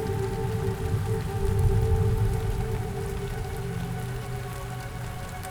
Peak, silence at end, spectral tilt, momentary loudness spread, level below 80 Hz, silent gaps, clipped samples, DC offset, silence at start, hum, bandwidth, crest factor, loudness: -12 dBFS; 0 s; -7 dB/octave; 11 LU; -34 dBFS; none; under 0.1%; under 0.1%; 0 s; none; over 20 kHz; 16 dB; -29 LUFS